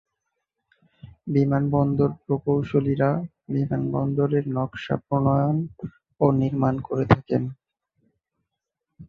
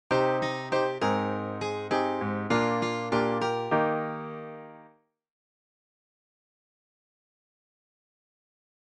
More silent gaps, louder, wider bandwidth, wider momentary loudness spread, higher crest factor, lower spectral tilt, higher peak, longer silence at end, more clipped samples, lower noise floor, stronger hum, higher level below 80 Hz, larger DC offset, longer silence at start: neither; first, -23 LUFS vs -28 LUFS; second, 5.2 kHz vs 10 kHz; second, 8 LU vs 12 LU; about the same, 22 dB vs 18 dB; first, -10 dB/octave vs -6 dB/octave; first, -2 dBFS vs -12 dBFS; second, 0.05 s vs 4 s; neither; first, -83 dBFS vs -60 dBFS; neither; first, -50 dBFS vs -66 dBFS; neither; first, 1.05 s vs 0.1 s